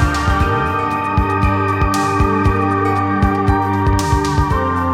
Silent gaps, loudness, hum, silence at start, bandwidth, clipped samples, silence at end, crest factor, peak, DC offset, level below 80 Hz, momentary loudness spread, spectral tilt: none; -16 LUFS; none; 0 s; 15.5 kHz; under 0.1%; 0 s; 12 dB; -2 dBFS; under 0.1%; -24 dBFS; 2 LU; -6.5 dB/octave